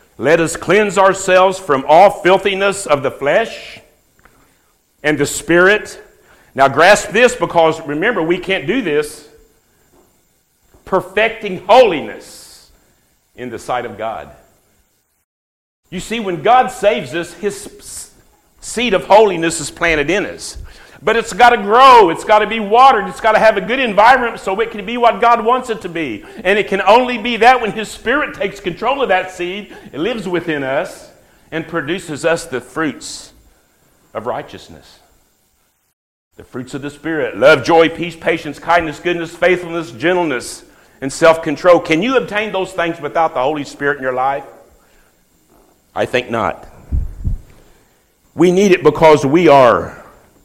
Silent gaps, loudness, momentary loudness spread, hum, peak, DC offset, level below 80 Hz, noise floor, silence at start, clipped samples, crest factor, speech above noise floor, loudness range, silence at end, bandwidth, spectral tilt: 15.24-15.83 s, 35.93-36.31 s; -14 LUFS; 18 LU; none; 0 dBFS; under 0.1%; -38 dBFS; -60 dBFS; 0.2 s; under 0.1%; 16 dB; 46 dB; 12 LU; 0.4 s; 16 kHz; -4.5 dB/octave